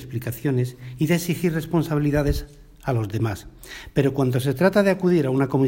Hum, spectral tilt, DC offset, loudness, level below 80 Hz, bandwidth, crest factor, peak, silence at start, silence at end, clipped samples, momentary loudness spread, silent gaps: none; -7 dB/octave; under 0.1%; -23 LUFS; -38 dBFS; 16.5 kHz; 18 dB; -4 dBFS; 0 s; 0 s; under 0.1%; 11 LU; none